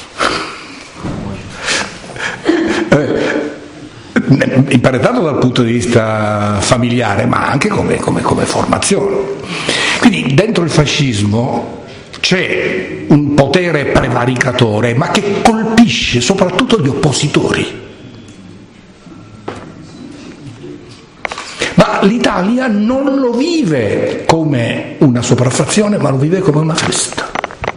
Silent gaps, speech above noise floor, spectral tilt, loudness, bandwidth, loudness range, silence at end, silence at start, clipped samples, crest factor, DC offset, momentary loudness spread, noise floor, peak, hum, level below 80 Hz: none; 26 dB; -5 dB/octave; -12 LUFS; 11 kHz; 6 LU; 0 s; 0 s; 0.3%; 12 dB; under 0.1%; 16 LU; -38 dBFS; 0 dBFS; none; -38 dBFS